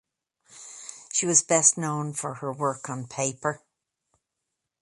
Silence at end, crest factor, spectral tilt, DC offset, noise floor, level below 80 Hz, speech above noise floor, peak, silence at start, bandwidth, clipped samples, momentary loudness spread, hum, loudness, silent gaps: 1.25 s; 24 dB; -3 dB/octave; under 0.1%; -83 dBFS; -72 dBFS; 57 dB; -4 dBFS; 0.55 s; 11.5 kHz; under 0.1%; 21 LU; none; -24 LUFS; none